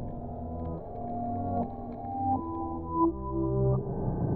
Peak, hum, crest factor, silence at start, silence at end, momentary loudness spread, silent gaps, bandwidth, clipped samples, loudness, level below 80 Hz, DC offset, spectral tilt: -14 dBFS; none; 16 dB; 0 s; 0 s; 10 LU; none; 2.4 kHz; under 0.1%; -32 LUFS; -44 dBFS; under 0.1%; -14.5 dB/octave